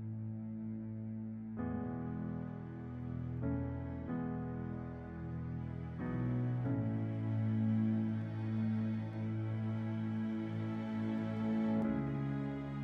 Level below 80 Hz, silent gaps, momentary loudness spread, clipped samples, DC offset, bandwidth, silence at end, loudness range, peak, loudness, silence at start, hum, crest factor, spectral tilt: -58 dBFS; none; 9 LU; under 0.1%; under 0.1%; 4.9 kHz; 0 s; 5 LU; -24 dBFS; -39 LUFS; 0 s; none; 12 dB; -10.5 dB/octave